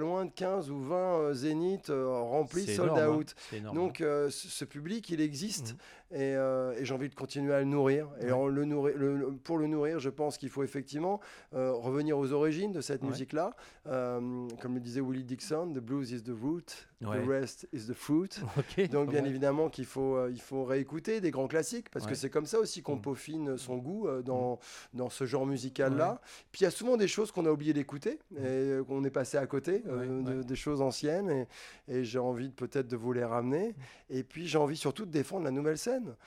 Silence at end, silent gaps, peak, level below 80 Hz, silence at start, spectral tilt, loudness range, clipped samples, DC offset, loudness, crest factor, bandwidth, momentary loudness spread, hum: 0.1 s; none; -14 dBFS; -66 dBFS; 0 s; -6 dB/octave; 4 LU; under 0.1%; under 0.1%; -34 LUFS; 18 dB; 15.5 kHz; 8 LU; none